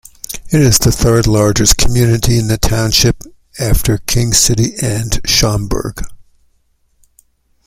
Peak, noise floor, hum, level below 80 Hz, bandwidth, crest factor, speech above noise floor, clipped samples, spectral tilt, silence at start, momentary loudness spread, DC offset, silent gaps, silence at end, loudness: 0 dBFS; -57 dBFS; none; -24 dBFS; 16.5 kHz; 14 dB; 46 dB; under 0.1%; -4 dB/octave; 0.3 s; 15 LU; under 0.1%; none; 1.45 s; -12 LUFS